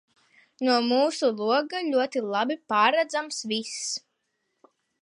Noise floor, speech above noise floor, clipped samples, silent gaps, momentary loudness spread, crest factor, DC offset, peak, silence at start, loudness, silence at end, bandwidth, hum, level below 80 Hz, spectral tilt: -77 dBFS; 52 dB; under 0.1%; none; 8 LU; 20 dB; under 0.1%; -6 dBFS; 0.6 s; -25 LUFS; 1.05 s; 11.5 kHz; none; -84 dBFS; -2.5 dB/octave